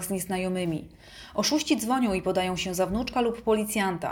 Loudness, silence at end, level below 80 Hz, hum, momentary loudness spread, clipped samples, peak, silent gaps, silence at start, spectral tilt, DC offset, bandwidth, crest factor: -27 LUFS; 0 s; -50 dBFS; none; 8 LU; under 0.1%; -12 dBFS; none; 0 s; -4 dB/octave; under 0.1%; over 20 kHz; 16 dB